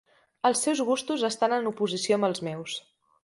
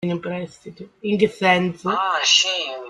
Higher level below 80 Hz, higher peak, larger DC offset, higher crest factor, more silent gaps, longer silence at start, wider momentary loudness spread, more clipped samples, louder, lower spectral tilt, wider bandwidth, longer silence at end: second, -74 dBFS vs -62 dBFS; second, -10 dBFS vs -2 dBFS; neither; about the same, 18 dB vs 18 dB; neither; first, 0.45 s vs 0 s; second, 9 LU vs 16 LU; neither; second, -27 LUFS vs -19 LUFS; about the same, -3.5 dB/octave vs -3 dB/octave; about the same, 11.5 kHz vs 11.5 kHz; first, 0.45 s vs 0 s